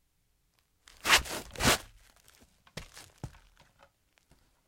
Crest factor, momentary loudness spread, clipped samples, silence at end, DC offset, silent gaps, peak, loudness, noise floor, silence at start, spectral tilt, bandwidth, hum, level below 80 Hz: 30 dB; 24 LU; under 0.1%; 1.4 s; under 0.1%; none; -6 dBFS; -27 LUFS; -73 dBFS; 1.05 s; -1.5 dB/octave; 16.5 kHz; none; -52 dBFS